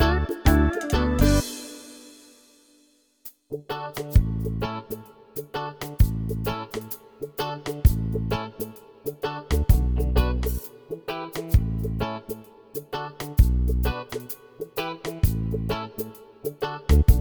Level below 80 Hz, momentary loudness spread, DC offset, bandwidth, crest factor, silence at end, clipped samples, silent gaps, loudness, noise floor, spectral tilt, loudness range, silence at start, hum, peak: -28 dBFS; 16 LU; under 0.1%; over 20 kHz; 22 dB; 0 s; under 0.1%; none; -26 LUFS; -62 dBFS; -6.5 dB/octave; 4 LU; 0 s; none; -2 dBFS